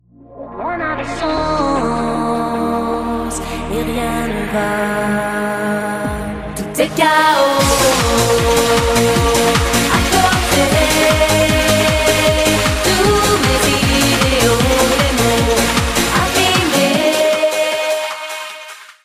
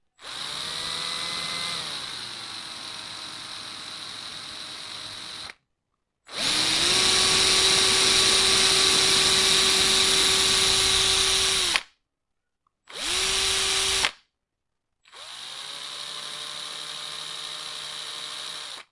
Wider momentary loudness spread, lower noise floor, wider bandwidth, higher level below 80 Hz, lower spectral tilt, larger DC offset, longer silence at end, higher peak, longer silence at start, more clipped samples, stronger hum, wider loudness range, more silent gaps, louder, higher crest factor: second, 9 LU vs 18 LU; second, -35 dBFS vs -82 dBFS; first, 16 kHz vs 11.5 kHz; first, -28 dBFS vs -50 dBFS; first, -3.5 dB/octave vs 0 dB/octave; neither; about the same, 0.15 s vs 0.1 s; about the same, -2 dBFS vs -2 dBFS; about the same, 0.3 s vs 0.2 s; neither; neither; second, 6 LU vs 17 LU; neither; first, -14 LUFS vs -20 LUFS; second, 14 dB vs 22 dB